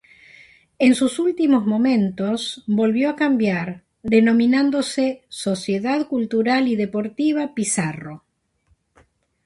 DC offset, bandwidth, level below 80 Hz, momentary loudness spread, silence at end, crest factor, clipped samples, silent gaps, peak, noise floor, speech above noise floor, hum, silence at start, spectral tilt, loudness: under 0.1%; 11.5 kHz; -60 dBFS; 9 LU; 1.3 s; 16 dB; under 0.1%; none; -4 dBFS; -64 dBFS; 45 dB; none; 0.8 s; -5 dB/octave; -20 LUFS